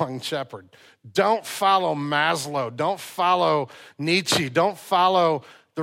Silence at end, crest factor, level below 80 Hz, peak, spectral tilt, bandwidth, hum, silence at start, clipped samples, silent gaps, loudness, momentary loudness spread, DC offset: 0 s; 16 dB; -68 dBFS; -6 dBFS; -4 dB/octave; 16.5 kHz; none; 0 s; under 0.1%; none; -22 LUFS; 11 LU; under 0.1%